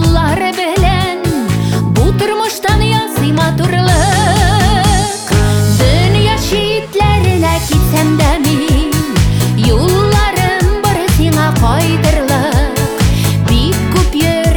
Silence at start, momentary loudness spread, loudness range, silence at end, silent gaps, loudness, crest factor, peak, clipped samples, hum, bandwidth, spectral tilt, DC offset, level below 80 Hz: 0 s; 4 LU; 1 LU; 0 s; none; -12 LUFS; 10 dB; 0 dBFS; under 0.1%; none; over 20 kHz; -5.5 dB/octave; under 0.1%; -18 dBFS